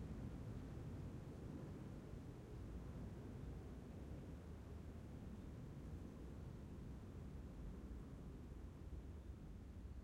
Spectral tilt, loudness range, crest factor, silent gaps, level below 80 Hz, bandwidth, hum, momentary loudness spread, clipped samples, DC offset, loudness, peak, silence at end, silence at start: -8 dB/octave; 2 LU; 14 dB; none; -58 dBFS; 16 kHz; none; 3 LU; under 0.1%; under 0.1%; -55 LUFS; -40 dBFS; 0 s; 0 s